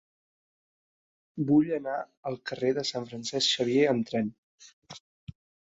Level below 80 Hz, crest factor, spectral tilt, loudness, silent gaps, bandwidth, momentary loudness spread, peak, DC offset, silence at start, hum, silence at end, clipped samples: -68 dBFS; 18 dB; -4.5 dB/octave; -28 LUFS; 2.17-2.23 s, 4.38-4.58 s, 4.73-4.82 s; 8 kHz; 21 LU; -12 dBFS; under 0.1%; 1.35 s; none; 0.75 s; under 0.1%